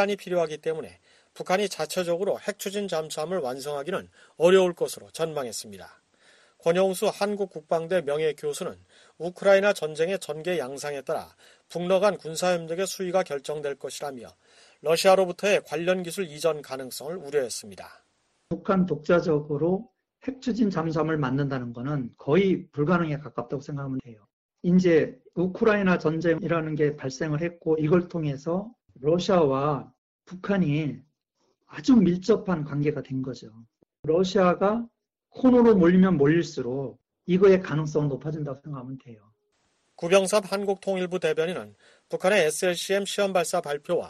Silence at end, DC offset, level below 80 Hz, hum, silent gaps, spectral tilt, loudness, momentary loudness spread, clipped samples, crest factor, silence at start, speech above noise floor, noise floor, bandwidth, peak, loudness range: 0 s; under 0.1%; -60 dBFS; none; 24.33-24.49 s, 29.98-30.19 s, 33.99-34.03 s; -6 dB/octave; -25 LUFS; 15 LU; under 0.1%; 18 dB; 0 s; 48 dB; -73 dBFS; 13 kHz; -6 dBFS; 6 LU